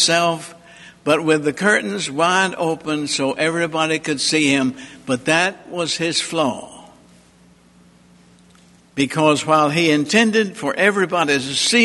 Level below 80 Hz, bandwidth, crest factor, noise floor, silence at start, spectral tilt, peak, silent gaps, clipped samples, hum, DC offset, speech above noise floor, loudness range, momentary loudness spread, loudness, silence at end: -60 dBFS; 11.5 kHz; 18 dB; -51 dBFS; 0 s; -3.5 dB/octave; 0 dBFS; none; under 0.1%; none; under 0.1%; 33 dB; 7 LU; 8 LU; -18 LUFS; 0 s